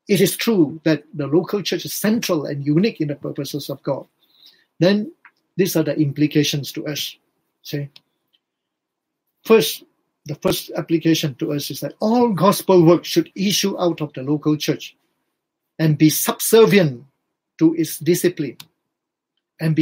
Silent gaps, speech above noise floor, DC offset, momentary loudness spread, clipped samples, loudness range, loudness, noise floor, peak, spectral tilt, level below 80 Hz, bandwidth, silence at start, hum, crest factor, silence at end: none; 62 dB; under 0.1%; 14 LU; under 0.1%; 6 LU; -19 LUFS; -81 dBFS; -2 dBFS; -5 dB/octave; -62 dBFS; 16.5 kHz; 0.1 s; none; 18 dB; 0 s